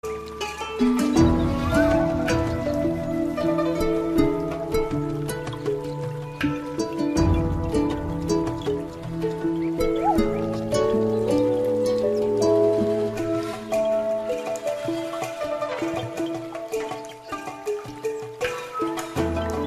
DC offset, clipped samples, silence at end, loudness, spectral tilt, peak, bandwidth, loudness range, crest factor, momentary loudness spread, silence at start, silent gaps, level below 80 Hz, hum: under 0.1%; under 0.1%; 0 s; -24 LUFS; -6.5 dB/octave; -6 dBFS; 14.5 kHz; 7 LU; 18 dB; 10 LU; 0.05 s; none; -38 dBFS; none